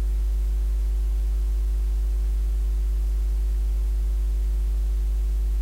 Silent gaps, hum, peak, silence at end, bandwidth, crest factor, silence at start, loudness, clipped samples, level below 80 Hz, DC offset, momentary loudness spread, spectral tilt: none; none; -18 dBFS; 0 s; 4.6 kHz; 4 dB; 0 s; -27 LUFS; under 0.1%; -22 dBFS; under 0.1%; 0 LU; -6.5 dB/octave